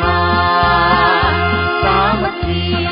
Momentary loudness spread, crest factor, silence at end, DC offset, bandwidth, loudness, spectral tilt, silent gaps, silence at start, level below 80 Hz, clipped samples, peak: 6 LU; 12 dB; 0 s; under 0.1%; 5.4 kHz; -13 LUFS; -11 dB/octave; none; 0 s; -26 dBFS; under 0.1%; -2 dBFS